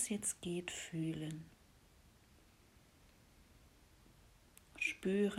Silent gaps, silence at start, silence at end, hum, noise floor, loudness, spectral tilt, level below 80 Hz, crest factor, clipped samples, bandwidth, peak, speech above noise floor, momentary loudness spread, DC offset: none; 0 s; 0 s; none; -67 dBFS; -41 LUFS; -4 dB/octave; -70 dBFS; 20 dB; under 0.1%; 16.5 kHz; -24 dBFS; 27 dB; 24 LU; under 0.1%